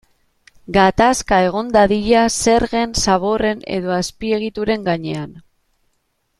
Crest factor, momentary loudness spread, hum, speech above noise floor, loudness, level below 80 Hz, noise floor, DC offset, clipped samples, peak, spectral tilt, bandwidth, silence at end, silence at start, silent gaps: 16 dB; 8 LU; none; 51 dB; -16 LUFS; -38 dBFS; -67 dBFS; under 0.1%; under 0.1%; 0 dBFS; -4 dB/octave; 13.5 kHz; 1 s; 0.7 s; none